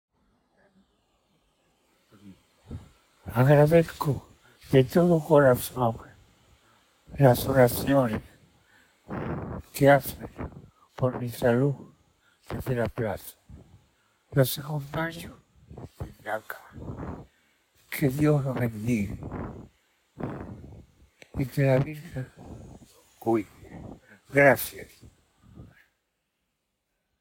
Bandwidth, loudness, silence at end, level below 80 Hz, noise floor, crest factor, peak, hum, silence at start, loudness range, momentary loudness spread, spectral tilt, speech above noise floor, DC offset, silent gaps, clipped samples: over 20 kHz; -25 LUFS; 1.55 s; -52 dBFS; -79 dBFS; 22 dB; -6 dBFS; none; 2.25 s; 9 LU; 24 LU; -6.5 dB/octave; 55 dB; under 0.1%; none; under 0.1%